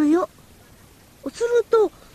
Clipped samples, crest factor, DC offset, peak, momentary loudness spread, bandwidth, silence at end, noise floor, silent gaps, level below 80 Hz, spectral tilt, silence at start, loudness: under 0.1%; 16 dB; under 0.1%; -8 dBFS; 16 LU; 14 kHz; 0.25 s; -50 dBFS; none; -56 dBFS; -5 dB/octave; 0 s; -21 LUFS